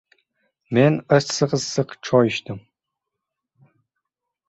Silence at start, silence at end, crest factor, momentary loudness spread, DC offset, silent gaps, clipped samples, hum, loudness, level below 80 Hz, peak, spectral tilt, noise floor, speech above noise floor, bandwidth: 0.7 s; 1.9 s; 22 dB; 10 LU; under 0.1%; none; under 0.1%; none; -20 LUFS; -60 dBFS; -2 dBFS; -5.5 dB/octave; -83 dBFS; 63 dB; 8.2 kHz